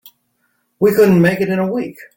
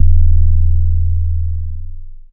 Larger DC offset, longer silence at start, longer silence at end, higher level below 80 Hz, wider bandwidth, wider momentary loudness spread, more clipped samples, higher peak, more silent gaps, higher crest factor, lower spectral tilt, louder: neither; first, 0.8 s vs 0 s; about the same, 0.1 s vs 0.1 s; second, -52 dBFS vs -12 dBFS; first, 17 kHz vs 0.3 kHz; second, 9 LU vs 14 LU; neither; about the same, -2 dBFS vs 0 dBFS; neither; about the same, 14 dB vs 10 dB; second, -7.5 dB/octave vs -17.5 dB/octave; first, -14 LUFS vs -17 LUFS